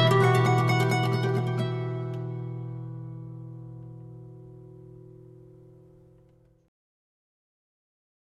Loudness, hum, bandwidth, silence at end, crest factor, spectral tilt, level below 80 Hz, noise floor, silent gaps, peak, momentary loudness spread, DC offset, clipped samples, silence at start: -26 LUFS; none; 13.5 kHz; 2.85 s; 20 dB; -6.5 dB/octave; -64 dBFS; -60 dBFS; none; -10 dBFS; 26 LU; under 0.1%; under 0.1%; 0 s